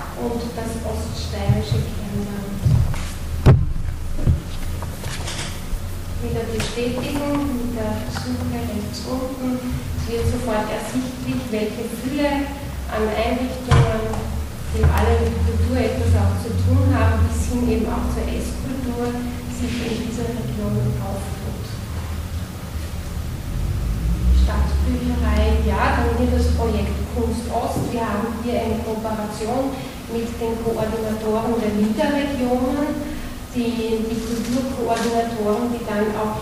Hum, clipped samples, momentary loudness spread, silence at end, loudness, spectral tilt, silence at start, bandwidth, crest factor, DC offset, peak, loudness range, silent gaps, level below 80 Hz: none; under 0.1%; 10 LU; 0 s; -22 LUFS; -6.5 dB/octave; 0 s; 16 kHz; 16 dB; under 0.1%; -6 dBFS; 6 LU; none; -26 dBFS